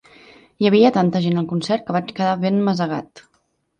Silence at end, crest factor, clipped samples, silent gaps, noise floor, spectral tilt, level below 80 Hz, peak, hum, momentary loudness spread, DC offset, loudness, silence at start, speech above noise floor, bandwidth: 0.6 s; 18 dB; under 0.1%; none; -66 dBFS; -7.5 dB/octave; -62 dBFS; -2 dBFS; none; 9 LU; under 0.1%; -19 LUFS; 0.6 s; 48 dB; 9.2 kHz